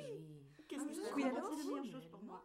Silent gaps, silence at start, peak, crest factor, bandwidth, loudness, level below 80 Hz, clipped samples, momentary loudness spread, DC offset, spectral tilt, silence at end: none; 0 s; -28 dBFS; 18 dB; 16 kHz; -44 LUFS; -82 dBFS; under 0.1%; 14 LU; under 0.1%; -5 dB/octave; 0 s